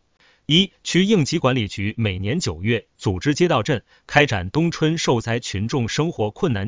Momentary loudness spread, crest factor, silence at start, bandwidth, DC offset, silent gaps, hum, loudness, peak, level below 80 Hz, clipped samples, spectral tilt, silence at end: 7 LU; 20 dB; 0.5 s; 7.6 kHz; under 0.1%; none; none; -21 LUFS; 0 dBFS; -42 dBFS; under 0.1%; -5 dB/octave; 0 s